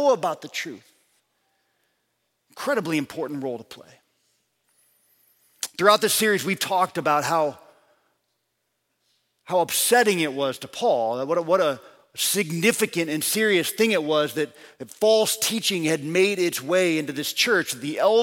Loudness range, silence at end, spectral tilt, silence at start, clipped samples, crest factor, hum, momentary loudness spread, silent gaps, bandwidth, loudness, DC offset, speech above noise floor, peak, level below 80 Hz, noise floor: 9 LU; 0 s; -3 dB/octave; 0 s; under 0.1%; 22 dB; none; 13 LU; none; 17 kHz; -22 LUFS; under 0.1%; 53 dB; -2 dBFS; -74 dBFS; -76 dBFS